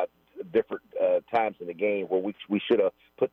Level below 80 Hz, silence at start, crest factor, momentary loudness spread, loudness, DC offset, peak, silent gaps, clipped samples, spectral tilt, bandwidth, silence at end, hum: -74 dBFS; 0 s; 14 dB; 7 LU; -28 LUFS; under 0.1%; -12 dBFS; none; under 0.1%; -8 dB/octave; 5.4 kHz; 0.05 s; none